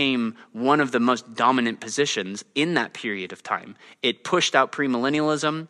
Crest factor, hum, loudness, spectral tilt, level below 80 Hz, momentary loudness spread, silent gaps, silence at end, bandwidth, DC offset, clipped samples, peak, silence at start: 20 dB; none; -23 LUFS; -3.5 dB/octave; -72 dBFS; 9 LU; none; 0.05 s; 11.5 kHz; under 0.1%; under 0.1%; -4 dBFS; 0 s